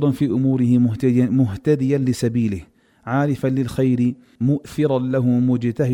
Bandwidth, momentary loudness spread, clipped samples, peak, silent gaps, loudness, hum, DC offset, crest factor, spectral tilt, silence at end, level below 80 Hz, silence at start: 12 kHz; 6 LU; under 0.1%; -6 dBFS; none; -19 LUFS; none; under 0.1%; 12 dB; -8.5 dB/octave; 0 s; -50 dBFS; 0 s